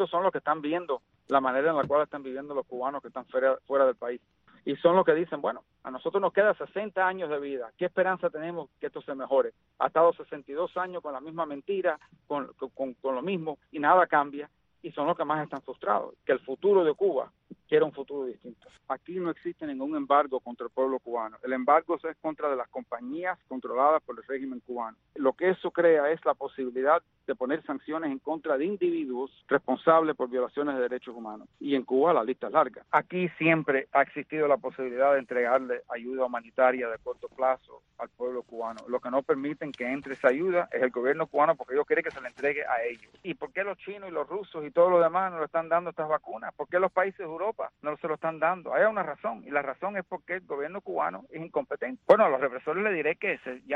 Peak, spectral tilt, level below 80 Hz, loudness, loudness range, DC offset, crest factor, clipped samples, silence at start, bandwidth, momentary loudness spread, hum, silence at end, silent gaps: -6 dBFS; -8 dB/octave; -72 dBFS; -28 LUFS; 4 LU; under 0.1%; 22 dB; under 0.1%; 0 s; 5.8 kHz; 13 LU; none; 0 s; none